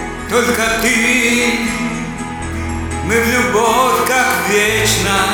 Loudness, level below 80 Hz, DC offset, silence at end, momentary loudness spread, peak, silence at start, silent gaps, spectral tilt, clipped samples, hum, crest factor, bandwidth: -14 LUFS; -34 dBFS; under 0.1%; 0 s; 10 LU; 0 dBFS; 0 s; none; -3 dB/octave; under 0.1%; none; 14 dB; over 20 kHz